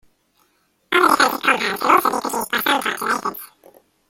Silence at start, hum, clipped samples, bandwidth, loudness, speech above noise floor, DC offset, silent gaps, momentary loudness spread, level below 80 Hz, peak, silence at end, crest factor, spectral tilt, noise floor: 0.9 s; none; under 0.1%; 16.5 kHz; -18 LUFS; 43 dB; under 0.1%; none; 8 LU; -62 dBFS; -2 dBFS; 0.65 s; 20 dB; -2 dB/octave; -63 dBFS